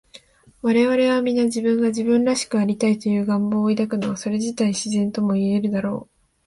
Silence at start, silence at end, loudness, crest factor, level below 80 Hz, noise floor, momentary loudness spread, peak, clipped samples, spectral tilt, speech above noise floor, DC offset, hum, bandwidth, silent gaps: 0.15 s; 0.45 s; -21 LUFS; 14 dB; -60 dBFS; -49 dBFS; 6 LU; -8 dBFS; under 0.1%; -5.5 dB/octave; 29 dB; under 0.1%; none; 11.5 kHz; none